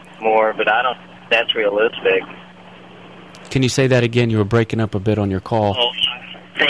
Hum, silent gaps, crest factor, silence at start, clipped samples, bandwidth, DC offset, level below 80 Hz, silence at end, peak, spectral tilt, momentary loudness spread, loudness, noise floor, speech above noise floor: none; none; 16 dB; 0 s; under 0.1%; 11 kHz; 0.2%; -50 dBFS; 0 s; -2 dBFS; -5.5 dB/octave; 8 LU; -17 LUFS; -41 dBFS; 24 dB